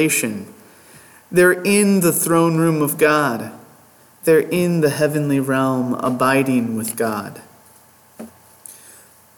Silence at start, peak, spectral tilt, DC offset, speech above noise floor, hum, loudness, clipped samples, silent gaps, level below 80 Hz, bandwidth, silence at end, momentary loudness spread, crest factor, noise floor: 0 s; -4 dBFS; -5 dB/octave; under 0.1%; 33 dB; none; -17 LUFS; under 0.1%; none; -62 dBFS; 19 kHz; 0.65 s; 12 LU; 16 dB; -50 dBFS